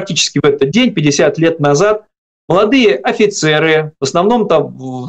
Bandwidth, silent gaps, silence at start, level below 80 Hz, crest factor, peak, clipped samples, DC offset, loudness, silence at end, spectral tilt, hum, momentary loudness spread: 9 kHz; 2.18-2.48 s; 0 s; -48 dBFS; 10 dB; -2 dBFS; under 0.1%; under 0.1%; -12 LUFS; 0 s; -4.5 dB/octave; none; 4 LU